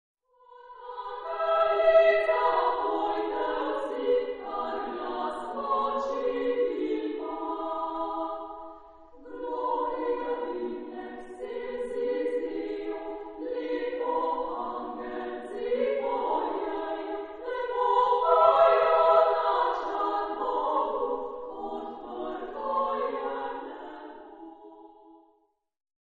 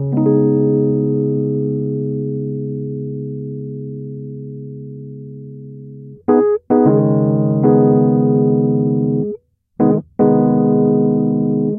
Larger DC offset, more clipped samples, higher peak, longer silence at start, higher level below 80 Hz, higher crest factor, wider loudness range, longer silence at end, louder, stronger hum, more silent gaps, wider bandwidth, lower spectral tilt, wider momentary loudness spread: neither; neither; second, -8 dBFS vs 0 dBFS; first, 0.5 s vs 0 s; about the same, -60 dBFS vs -56 dBFS; first, 22 dB vs 16 dB; second, 10 LU vs 13 LU; first, 0.9 s vs 0 s; second, -28 LUFS vs -15 LUFS; neither; neither; first, 7.2 kHz vs 2.2 kHz; second, -5 dB/octave vs -16 dB/octave; about the same, 17 LU vs 19 LU